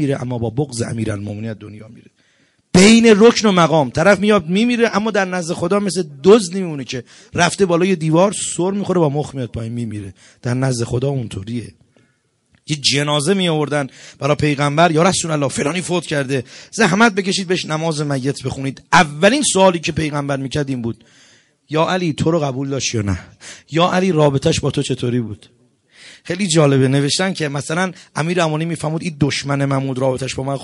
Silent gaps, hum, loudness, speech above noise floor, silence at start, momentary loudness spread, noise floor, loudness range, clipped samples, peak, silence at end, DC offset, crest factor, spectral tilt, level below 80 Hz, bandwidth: none; none; -16 LUFS; 45 dB; 0 s; 13 LU; -61 dBFS; 7 LU; under 0.1%; 0 dBFS; 0 s; under 0.1%; 16 dB; -5 dB/octave; -48 dBFS; 11.5 kHz